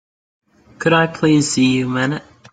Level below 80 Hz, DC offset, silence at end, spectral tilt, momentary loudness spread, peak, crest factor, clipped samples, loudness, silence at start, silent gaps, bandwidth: -54 dBFS; under 0.1%; 0.3 s; -5 dB/octave; 7 LU; -2 dBFS; 16 dB; under 0.1%; -16 LUFS; 0.8 s; none; 9.4 kHz